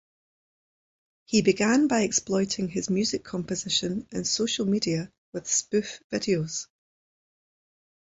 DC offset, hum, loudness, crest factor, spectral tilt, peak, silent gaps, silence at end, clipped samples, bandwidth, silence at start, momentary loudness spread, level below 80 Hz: under 0.1%; none; -26 LUFS; 20 dB; -3.5 dB/octave; -8 dBFS; 5.18-5.32 s, 6.04-6.10 s; 1.45 s; under 0.1%; 8.2 kHz; 1.3 s; 10 LU; -62 dBFS